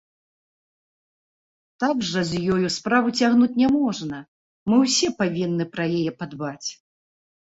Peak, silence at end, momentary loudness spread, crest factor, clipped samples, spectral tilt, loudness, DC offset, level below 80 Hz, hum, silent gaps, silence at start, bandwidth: -6 dBFS; 0.8 s; 13 LU; 18 dB; under 0.1%; -4.5 dB/octave; -22 LUFS; under 0.1%; -60 dBFS; none; 4.28-4.66 s; 1.8 s; 8 kHz